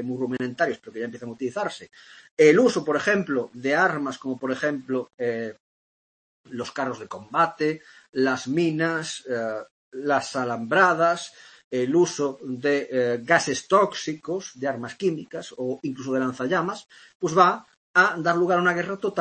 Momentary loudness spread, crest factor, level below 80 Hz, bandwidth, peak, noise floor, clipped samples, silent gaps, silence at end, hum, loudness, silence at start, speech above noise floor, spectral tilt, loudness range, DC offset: 14 LU; 22 dB; -70 dBFS; 8.8 kHz; -4 dBFS; under -90 dBFS; under 0.1%; 2.31-2.37 s, 5.14-5.18 s, 5.60-6.44 s, 8.09-8.13 s, 9.71-9.92 s, 11.64-11.71 s, 17.15-17.20 s, 17.77-17.94 s; 0 s; none; -24 LUFS; 0 s; over 66 dB; -5 dB/octave; 6 LU; under 0.1%